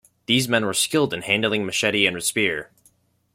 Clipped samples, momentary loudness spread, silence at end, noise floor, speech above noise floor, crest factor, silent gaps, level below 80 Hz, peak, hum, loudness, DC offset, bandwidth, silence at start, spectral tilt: under 0.1%; 3 LU; 0.7 s; -61 dBFS; 39 dB; 20 dB; none; -62 dBFS; -2 dBFS; none; -21 LUFS; under 0.1%; 16.5 kHz; 0.3 s; -3 dB/octave